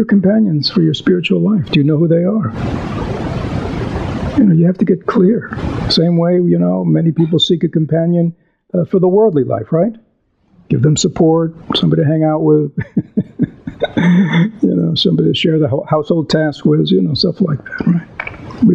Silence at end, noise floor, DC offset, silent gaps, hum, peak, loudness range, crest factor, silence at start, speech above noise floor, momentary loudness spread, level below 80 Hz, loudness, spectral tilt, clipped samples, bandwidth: 0 s; -56 dBFS; under 0.1%; none; none; 0 dBFS; 2 LU; 14 dB; 0 s; 43 dB; 9 LU; -38 dBFS; -14 LUFS; -6.5 dB/octave; under 0.1%; 8 kHz